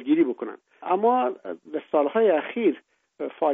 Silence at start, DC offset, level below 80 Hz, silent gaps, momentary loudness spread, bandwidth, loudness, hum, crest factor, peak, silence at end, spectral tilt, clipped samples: 0 s; under 0.1%; -78 dBFS; none; 16 LU; 3.8 kHz; -24 LUFS; none; 14 dB; -10 dBFS; 0 s; -4 dB/octave; under 0.1%